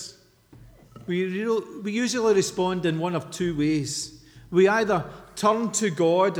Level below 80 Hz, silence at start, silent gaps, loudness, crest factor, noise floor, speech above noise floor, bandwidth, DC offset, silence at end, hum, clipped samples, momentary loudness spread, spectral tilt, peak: -58 dBFS; 0 s; none; -24 LUFS; 18 dB; -53 dBFS; 29 dB; 17 kHz; under 0.1%; 0 s; none; under 0.1%; 10 LU; -4.5 dB/octave; -8 dBFS